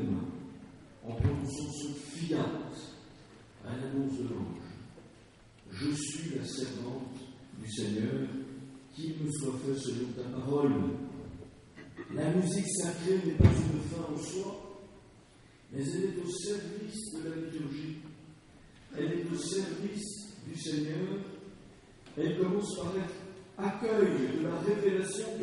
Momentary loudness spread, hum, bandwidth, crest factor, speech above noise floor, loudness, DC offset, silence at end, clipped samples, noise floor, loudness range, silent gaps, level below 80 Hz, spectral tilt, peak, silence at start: 19 LU; none; 11.5 kHz; 26 dB; 26 dB; -34 LUFS; under 0.1%; 0 s; under 0.1%; -58 dBFS; 8 LU; none; -52 dBFS; -6 dB/octave; -10 dBFS; 0 s